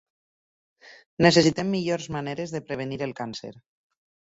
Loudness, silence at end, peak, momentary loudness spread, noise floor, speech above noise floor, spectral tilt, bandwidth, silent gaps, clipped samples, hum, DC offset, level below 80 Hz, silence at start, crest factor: -25 LUFS; 0.85 s; -4 dBFS; 18 LU; under -90 dBFS; over 65 dB; -5 dB/octave; 8 kHz; 1.06-1.17 s; under 0.1%; none; under 0.1%; -58 dBFS; 0.85 s; 24 dB